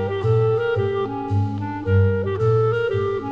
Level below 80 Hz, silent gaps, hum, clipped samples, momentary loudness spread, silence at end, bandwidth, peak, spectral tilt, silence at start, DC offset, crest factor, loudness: -48 dBFS; none; none; under 0.1%; 5 LU; 0 s; 5.8 kHz; -8 dBFS; -9 dB/octave; 0 s; 0.3%; 12 dB; -21 LUFS